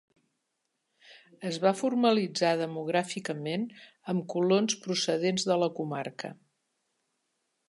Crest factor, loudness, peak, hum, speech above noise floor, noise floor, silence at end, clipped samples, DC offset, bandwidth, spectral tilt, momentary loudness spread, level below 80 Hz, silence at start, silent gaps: 20 dB; -29 LUFS; -12 dBFS; none; 52 dB; -81 dBFS; 1.35 s; under 0.1%; under 0.1%; 11.5 kHz; -4.5 dB/octave; 13 LU; -82 dBFS; 1.1 s; none